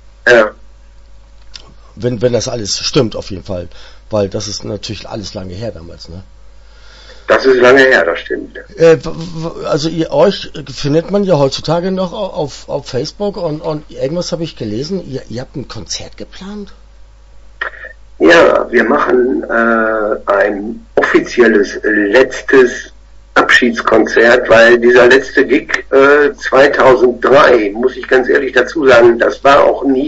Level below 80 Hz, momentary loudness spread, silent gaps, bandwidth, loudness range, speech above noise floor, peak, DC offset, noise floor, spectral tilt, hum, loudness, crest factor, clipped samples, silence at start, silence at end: -38 dBFS; 18 LU; none; 8 kHz; 13 LU; 27 dB; 0 dBFS; under 0.1%; -38 dBFS; -5 dB/octave; none; -11 LUFS; 12 dB; 0.2%; 0.25 s; 0 s